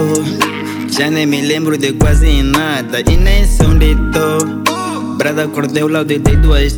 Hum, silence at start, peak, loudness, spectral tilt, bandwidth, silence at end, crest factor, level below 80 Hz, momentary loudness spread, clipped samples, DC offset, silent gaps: none; 0 s; 0 dBFS; -13 LUFS; -5 dB/octave; 19.5 kHz; 0 s; 12 dB; -14 dBFS; 5 LU; under 0.1%; under 0.1%; none